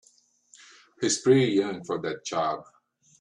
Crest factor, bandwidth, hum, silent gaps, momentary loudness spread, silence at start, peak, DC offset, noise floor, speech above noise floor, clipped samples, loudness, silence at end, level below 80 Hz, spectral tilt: 18 dB; 11 kHz; none; none; 11 LU; 1 s; -8 dBFS; under 0.1%; -63 dBFS; 38 dB; under 0.1%; -26 LUFS; 0.6 s; -68 dBFS; -4.5 dB/octave